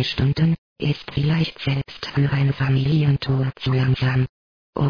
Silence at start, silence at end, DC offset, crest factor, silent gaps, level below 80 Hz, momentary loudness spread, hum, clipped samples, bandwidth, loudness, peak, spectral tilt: 0 s; 0 s; 0.3%; 12 dB; 0.58-0.76 s, 4.29-4.73 s; -44 dBFS; 6 LU; none; under 0.1%; 5.4 kHz; -21 LUFS; -8 dBFS; -8 dB/octave